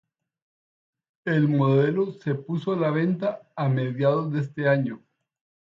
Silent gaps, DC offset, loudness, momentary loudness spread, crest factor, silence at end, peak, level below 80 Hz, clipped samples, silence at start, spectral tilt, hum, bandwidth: none; under 0.1%; -24 LUFS; 9 LU; 16 dB; 0.8 s; -8 dBFS; -70 dBFS; under 0.1%; 1.25 s; -9.5 dB/octave; none; 5.6 kHz